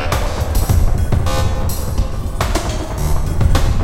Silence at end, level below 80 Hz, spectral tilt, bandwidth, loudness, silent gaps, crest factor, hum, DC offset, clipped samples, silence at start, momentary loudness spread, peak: 0 s; -18 dBFS; -5.5 dB/octave; 16.5 kHz; -19 LUFS; none; 14 dB; none; under 0.1%; under 0.1%; 0 s; 5 LU; 0 dBFS